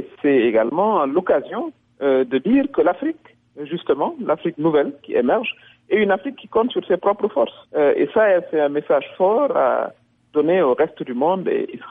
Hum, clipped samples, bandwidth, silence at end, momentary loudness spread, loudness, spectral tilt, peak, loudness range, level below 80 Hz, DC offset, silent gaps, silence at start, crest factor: none; under 0.1%; 4.6 kHz; 0 s; 8 LU; -19 LUFS; -9.5 dB/octave; -8 dBFS; 3 LU; -62 dBFS; under 0.1%; none; 0 s; 12 dB